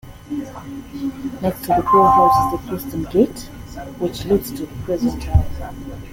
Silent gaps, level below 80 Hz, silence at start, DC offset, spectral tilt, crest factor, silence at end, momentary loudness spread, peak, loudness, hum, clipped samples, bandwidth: none; -32 dBFS; 0.05 s; under 0.1%; -7 dB/octave; 18 dB; 0 s; 20 LU; -2 dBFS; -19 LUFS; none; under 0.1%; 17 kHz